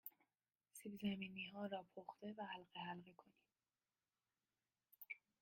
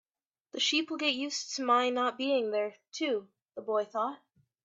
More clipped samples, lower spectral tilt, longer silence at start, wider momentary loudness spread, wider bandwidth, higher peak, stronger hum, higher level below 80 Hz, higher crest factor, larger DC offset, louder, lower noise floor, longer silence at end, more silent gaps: neither; first, -5 dB/octave vs -1.5 dB/octave; second, 0.05 s vs 0.55 s; about the same, 12 LU vs 10 LU; first, 16 kHz vs 8.4 kHz; second, -34 dBFS vs -14 dBFS; neither; about the same, -88 dBFS vs -84 dBFS; about the same, 20 dB vs 18 dB; neither; second, -52 LUFS vs -31 LUFS; first, under -90 dBFS vs -73 dBFS; second, 0.25 s vs 0.5 s; neither